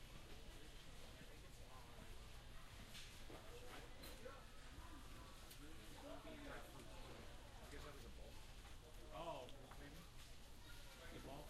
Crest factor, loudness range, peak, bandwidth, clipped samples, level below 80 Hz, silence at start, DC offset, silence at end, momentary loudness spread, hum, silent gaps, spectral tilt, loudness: 16 dB; 2 LU; -40 dBFS; 13 kHz; under 0.1%; -60 dBFS; 0 s; under 0.1%; 0 s; 5 LU; none; none; -4 dB/octave; -59 LUFS